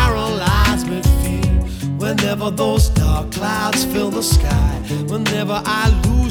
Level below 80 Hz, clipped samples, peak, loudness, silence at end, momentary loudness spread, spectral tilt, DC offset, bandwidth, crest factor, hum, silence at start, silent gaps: -20 dBFS; under 0.1%; -2 dBFS; -17 LUFS; 0 s; 5 LU; -5 dB/octave; under 0.1%; 19 kHz; 14 dB; none; 0 s; none